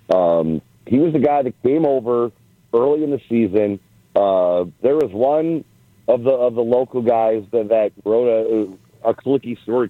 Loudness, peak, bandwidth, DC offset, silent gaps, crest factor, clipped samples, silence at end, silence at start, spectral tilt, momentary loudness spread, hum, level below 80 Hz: -18 LUFS; -4 dBFS; 5.8 kHz; under 0.1%; none; 14 dB; under 0.1%; 0 s; 0.1 s; -9 dB/octave; 7 LU; none; -58 dBFS